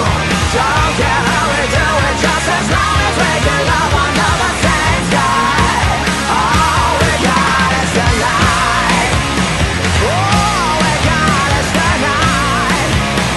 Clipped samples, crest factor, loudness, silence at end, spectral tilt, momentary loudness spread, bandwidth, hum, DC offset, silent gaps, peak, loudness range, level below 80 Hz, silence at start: under 0.1%; 12 dB; -12 LUFS; 0 s; -4 dB/octave; 2 LU; 12.5 kHz; none; under 0.1%; none; 0 dBFS; 1 LU; -24 dBFS; 0 s